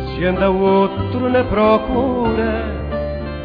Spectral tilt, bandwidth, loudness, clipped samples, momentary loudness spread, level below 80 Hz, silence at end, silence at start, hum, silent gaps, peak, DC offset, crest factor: -10 dB/octave; 5.2 kHz; -17 LUFS; under 0.1%; 9 LU; -30 dBFS; 0 s; 0 s; none; none; -2 dBFS; under 0.1%; 14 dB